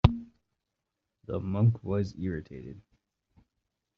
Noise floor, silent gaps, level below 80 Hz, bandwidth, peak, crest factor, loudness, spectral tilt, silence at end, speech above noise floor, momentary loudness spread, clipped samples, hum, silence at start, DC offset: -85 dBFS; none; -44 dBFS; 6.6 kHz; -2 dBFS; 28 dB; -31 LUFS; -8 dB/octave; 1.2 s; 55 dB; 21 LU; under 0.1%; none; 0.05 s; under 0.1%